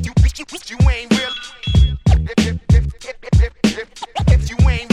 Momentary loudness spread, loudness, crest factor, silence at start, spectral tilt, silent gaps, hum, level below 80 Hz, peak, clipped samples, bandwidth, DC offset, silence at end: 12 LU; -17 LUFS; 14 dB; 0 s; -6 dB/octave; none; none; -18 dBFS; 0 dBFS; under 0.1%; 11.5 kHz; under 0.1%; 0.05 s